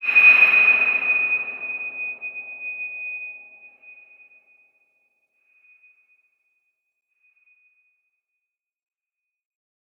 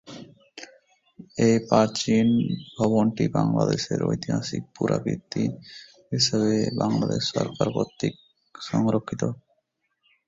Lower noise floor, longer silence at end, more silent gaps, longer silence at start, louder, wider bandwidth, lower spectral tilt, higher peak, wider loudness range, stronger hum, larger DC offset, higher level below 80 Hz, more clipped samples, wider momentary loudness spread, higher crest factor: first, -86 dBFS vs -75 dBFS; first, 6.35 s vs 0.95 s; neither; about the same, 0 s vs 0.05 s; first, -17 LUFS vs -24 LUFS; first, 13 kHz vs 7.8 kHz; second, -2.5 dB/octave vs -5.5 dB/octave; about the same, -4 dBFS vs -4 dBFS; first, 21 LU vs 4 LU; neither; neither; second, -86 dBFS vs -56 dBFS; neither; about the same, 21 LU vs 20 LU; about the same, 22 dB vs 22 dB